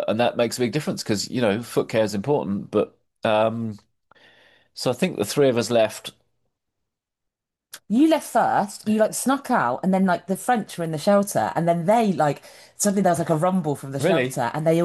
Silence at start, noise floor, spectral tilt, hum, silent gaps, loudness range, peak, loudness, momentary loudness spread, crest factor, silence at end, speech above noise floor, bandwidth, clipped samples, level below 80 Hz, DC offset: 0 s; -84 dBFS; -5.5 dB/octave; none; none; 4 LU; -8 dBFS; -22 LUFS; 7 LU; 14 dB; 0 s; 62 dB; 12.5 kHz; under 0.1%; -66 dBFS; under 0.1%